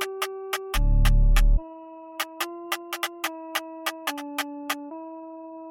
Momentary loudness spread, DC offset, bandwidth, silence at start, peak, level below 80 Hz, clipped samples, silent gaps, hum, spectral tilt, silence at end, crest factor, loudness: 17 LU; under 0.1%; 17 kHz; 0 s; -8 dBFS; -26 dBFS; under 0.1%; none; none; -4 dB/octave; 0 s; 16 dB; -28 LUFS